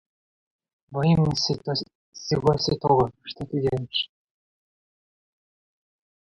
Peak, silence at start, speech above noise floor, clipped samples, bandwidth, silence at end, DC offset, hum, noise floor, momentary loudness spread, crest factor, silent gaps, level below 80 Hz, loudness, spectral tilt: -6 dBFS; 0.9 s; over 66 dB; under 0.1%; 8.2 kHz; 2.25 s; under 0.1%; none; under -90 dBFS; 13 LU; 20 dB; 1.95-2.12 s; -52 dBFS; -24 LUFS; -6 dB/octave